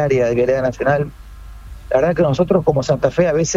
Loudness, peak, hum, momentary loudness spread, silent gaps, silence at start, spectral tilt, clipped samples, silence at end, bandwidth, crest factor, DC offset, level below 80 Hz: -17 LUFS; -2 dBFS; none; 4 LU; none; 0 s; -6 dB/octave; under 0.1%; 0 s; 8 kHz; 16 dB; under 0.1%; -38 dBFS